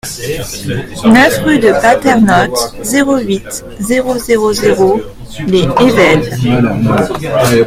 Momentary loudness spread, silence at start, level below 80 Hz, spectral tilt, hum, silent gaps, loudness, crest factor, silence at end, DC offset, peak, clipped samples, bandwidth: 12 LU; 0.05 s; -34 dBFS; -5 dB/octave; none; none; -11 LUFS; 10 dB; 0 s; under 0.1%; 0 dBFS; 0.3%; 16.5 kHz